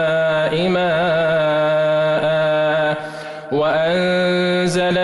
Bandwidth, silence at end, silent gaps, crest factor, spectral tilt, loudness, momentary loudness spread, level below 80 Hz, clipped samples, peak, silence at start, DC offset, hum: 11.5 kHz; 0 s; none; 8 dB; -5.5 dB/octave; -17 LUFS; 4 LU; -52 dBFS; under 0.1%; -8 dBFS; 0 s; under 0.1%; none